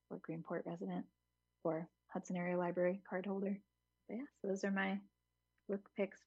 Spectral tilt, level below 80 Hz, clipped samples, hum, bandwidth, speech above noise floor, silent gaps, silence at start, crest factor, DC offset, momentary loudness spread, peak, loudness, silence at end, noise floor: -6.5 dB/octave; -88 dBFS; under 0.1%; none; 7.8 kHz; 44 dB; none; 0.1 s; 18 dB; under 0.1%; 11 LU; -24 dBFS; -43 LUFS; 0.1 s; -86 dBFS